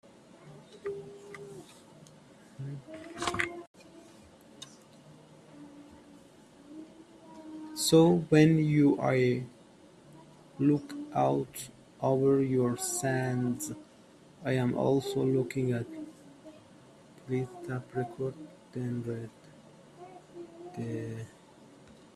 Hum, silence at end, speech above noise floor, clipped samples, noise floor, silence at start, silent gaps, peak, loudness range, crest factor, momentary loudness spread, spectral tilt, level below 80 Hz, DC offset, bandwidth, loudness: none; 0.9 s; 29 dB; under 0.1%; -57 dBFS; 0.45 s; 3.67-3.74 s; -10 dBFS; 14 LU; 22 dB; 25 LU; -6 dB/octave; -66 dBFS; under 0.1%; 14.5 kHz; -30 LUFS